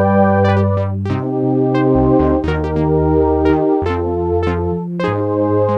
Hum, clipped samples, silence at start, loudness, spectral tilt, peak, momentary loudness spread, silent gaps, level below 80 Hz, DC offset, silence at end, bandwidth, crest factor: none; under 0.1%; 0 s; -15 LUFS; -9.5 dB/octave; -2 dBFS; 6 LU; none; -30 dBFS; under 0.1%; 0 s; 6.6 kHz; 12 dB